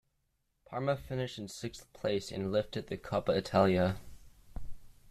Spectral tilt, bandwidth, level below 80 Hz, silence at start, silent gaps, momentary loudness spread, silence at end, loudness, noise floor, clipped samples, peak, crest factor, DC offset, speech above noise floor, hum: -6 dB/octave; 14 kHz; -54 dBFS; 0.7 s; none; 17 LU; 0 s; -34 LUFS; -78 dBFS; under 0.1%; -14 dBFS; 20 dB; under 0.1%; 45 dB; none